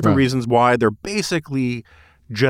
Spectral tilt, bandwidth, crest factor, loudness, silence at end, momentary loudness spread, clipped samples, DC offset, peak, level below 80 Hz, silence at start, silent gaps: -6 dB/octave; 16 kHz; 16 dB; -19 LUFS; 0 s; 10 LU; under 0.1%; under 0.1%; -4 dBFS; -48 dBFS; 0 s; none